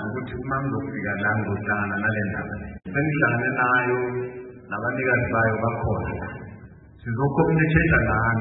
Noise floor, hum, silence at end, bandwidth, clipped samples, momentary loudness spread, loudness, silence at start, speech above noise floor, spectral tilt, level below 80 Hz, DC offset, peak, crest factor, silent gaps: -45 dBFS; none; 0 s; 4 kHz; under 0.1%; 14 LU; -23 LUFS; 0 s; 22 dB; -12 dB/octave; -42 dBFS; under 0.1%; -4 dBFS; 20 dB; none